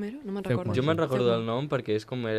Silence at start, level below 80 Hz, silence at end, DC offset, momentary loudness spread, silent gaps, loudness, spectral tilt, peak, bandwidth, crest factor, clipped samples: 0 s; -62 dBFS; 0 s; under 0.1%; 6 LU; none; -28 LUFS; -7.5 dB/octave; -12 dBFS; 14 kHz; 16 dB; under 0.1%